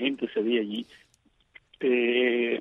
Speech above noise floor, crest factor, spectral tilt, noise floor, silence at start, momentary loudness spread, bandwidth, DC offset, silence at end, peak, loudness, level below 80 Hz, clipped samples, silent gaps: 38 dB; 16 dB; -6 dB/octave; -64 dBFS; 0 s; 12 LU; 4.9 kHz; under 0.1%; 0 s; -10 dBFS; -26 LUFS; -72 dBFS; under 0.1%; none